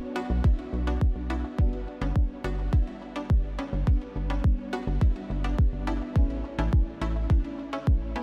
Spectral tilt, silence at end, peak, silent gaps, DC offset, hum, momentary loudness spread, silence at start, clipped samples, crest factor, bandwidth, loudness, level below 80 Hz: -8.5 dB/octave; 0 s; -14 dBFS; none; under 0.1%; none; 5 LU; 0 s; under 0.1%; 12 dB; 6.8 kHz; -28 LUFS; -26 dBFS